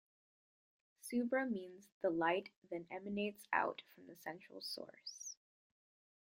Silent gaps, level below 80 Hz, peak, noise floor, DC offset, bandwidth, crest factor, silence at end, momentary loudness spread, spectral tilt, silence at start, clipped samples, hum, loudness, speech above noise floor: 1.92-2.01 s, 2.56-2.62 s; -86 dBFS; -20 dBFS; under -90 dBFS; under 0.1%; 16 kHz; 24 dB; 1.05 s; 15 LU; -4 dB/octave; 1.05 s; under 0.1%; none; -42 LUFS; over 48 dB